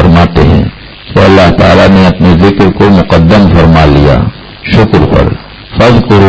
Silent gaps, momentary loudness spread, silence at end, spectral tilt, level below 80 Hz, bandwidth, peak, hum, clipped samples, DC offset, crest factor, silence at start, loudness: none; 9 LU; 0 s; -8 dB/octave; -16 dBFS; 8 kHz; 0 dBFS; none; 10%; under 0.1%; 4 dB; 0 s; -5 LUFS